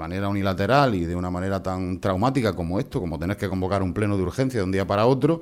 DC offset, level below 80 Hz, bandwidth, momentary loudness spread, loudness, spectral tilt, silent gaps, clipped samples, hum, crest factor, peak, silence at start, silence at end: under 0.1%; -46 dBFS; 15 kHz; 8 LU; -24 LUFS; -7 dB/octave; none; under 0.1%; none; 18 dB; -6 dBFS; 0 s; 0 s